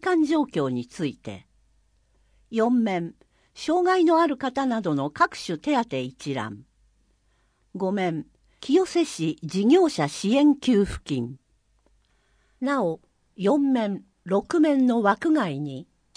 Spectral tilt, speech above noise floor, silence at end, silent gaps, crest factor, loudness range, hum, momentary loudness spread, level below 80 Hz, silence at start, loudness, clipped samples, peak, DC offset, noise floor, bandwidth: -6 dB/octave; 43 dB; 0.35 s; none; 18 dB; 6 LU; none; 15 LU; -54 dBFS; 0 s; -24 LUFS; under 0.1%; -8 dBFS; under 0.1%; -66 dBFS; 10.5 kHz